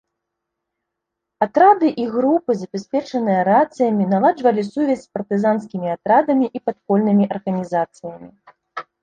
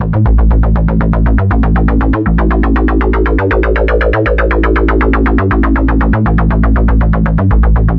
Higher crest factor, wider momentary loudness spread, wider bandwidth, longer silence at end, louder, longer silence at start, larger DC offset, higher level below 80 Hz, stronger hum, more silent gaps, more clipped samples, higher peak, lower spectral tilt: first, 18 dB vs 8 dB; first, 10 LU vs 1 LU; first, 8.8 kHz vs 4.2 kHz; first, 0.2 s vs 0 s; second, -18 LUFS vs -11 LUFS; first, 1.4 s vs 0 s; neither; second, -64 dBFS vs -12 dBFS; neither; neither; neither; about the same, -2 dBFS vs 0 dBFS; second, -8 dB/octave vs -10.5 dB/octave